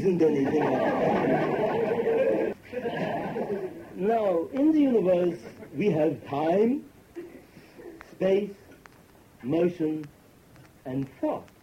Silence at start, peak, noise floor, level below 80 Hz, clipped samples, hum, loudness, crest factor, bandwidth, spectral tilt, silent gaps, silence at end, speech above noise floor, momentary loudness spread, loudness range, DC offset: 0 s; -12 dBFS; -55 dBFS; -62 dBFS; under 0.1%; none; -26 LUFS; 14 dB; 16 kHz; -8 dB/octave; none; 0.2 s; 30 dB; 20 LU; 6 LU; under 0.1%